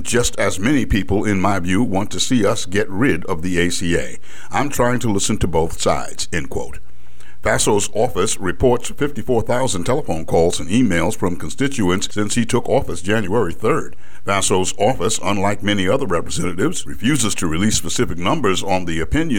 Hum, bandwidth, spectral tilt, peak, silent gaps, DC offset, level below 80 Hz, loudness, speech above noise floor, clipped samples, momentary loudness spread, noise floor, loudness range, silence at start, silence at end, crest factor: none; 18 kHz; -4.5 dB/octave; -4 dBFS; none; 10%; -36 dBFS; -19 LUFS; 28 dB; under 0.1%; 6 LU; -47 dBFS; 2 LU; 0 s; 0 s; 16 dB